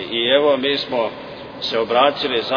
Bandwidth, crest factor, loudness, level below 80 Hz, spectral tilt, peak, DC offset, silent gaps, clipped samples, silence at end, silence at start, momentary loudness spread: 5.4 kHz; 18 dB; -18 LUFS; -56 dBFS; -5 dB/octave; -2 dBFS; under 0.1%; none; under 0.1%; 0 s; 0 s; 11 LU